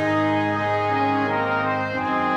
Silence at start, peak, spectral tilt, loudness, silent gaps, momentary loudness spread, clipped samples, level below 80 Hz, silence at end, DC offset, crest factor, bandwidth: 0 s; -10 dBFS; -7 dB/octave; -22 LUFS; none; 3 LU; under 0.1%; -62 dBFS; 0 s; under 0.1%; 10 dB; 9.8 kHz